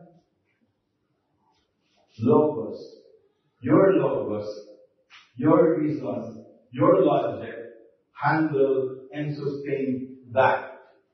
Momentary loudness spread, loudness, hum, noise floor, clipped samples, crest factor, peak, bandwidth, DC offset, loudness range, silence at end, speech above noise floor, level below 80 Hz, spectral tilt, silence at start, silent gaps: 18 LU; -24 LUFS; none; -74 dBFS; under 0.1%; 18 dB; -6 dBFS; 6.2 kHz; under 0.1%; 4 LU; 0.35 s; 51 dB; -70 dBFS; -9.5 dB/octave; 2.2 s; none